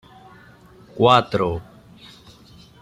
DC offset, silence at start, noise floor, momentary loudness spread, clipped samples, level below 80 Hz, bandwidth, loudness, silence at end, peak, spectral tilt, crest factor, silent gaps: under 0.1%; 0.95 s; -48 dBFS; 18 LU; under 0.1%; -52 dBFS; 13.5 kHz; -19 LUFS; 1.2 s; -2 dBFS; -6 dB/octave; 22 dB; none